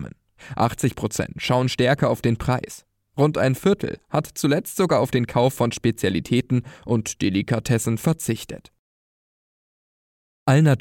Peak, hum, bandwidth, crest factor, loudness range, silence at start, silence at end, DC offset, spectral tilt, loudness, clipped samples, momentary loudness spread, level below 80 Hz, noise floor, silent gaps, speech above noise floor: -6 dBFS; none; 17 kHz; 16 dB; 4 LU; 0 s; 0 s; under 0.1%; -6 dB/octave; -22 LUFS; under 0.1%; 8 LU; -48 dBFS; under -90 dBFS; 8.79-10.46 s; over 69 dB